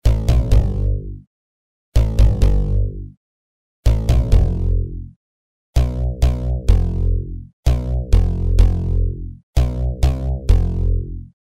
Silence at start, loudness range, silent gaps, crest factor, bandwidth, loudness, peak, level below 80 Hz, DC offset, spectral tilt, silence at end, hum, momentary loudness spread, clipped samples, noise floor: 0.05 s; 2 LU; 1.27-1.92 s, 3.17-3.83 s, 5.16-5.73 s, 7.53-7.63 s, 9.43-9.53 s; 16 dB; 11 kHz; -20 LUFS; 0 dBFS; -18 dBFS; 0.9%; -7.5 dB/octave; 0.15 s; none; 11 LU; under 0.1%; under -90 dBFS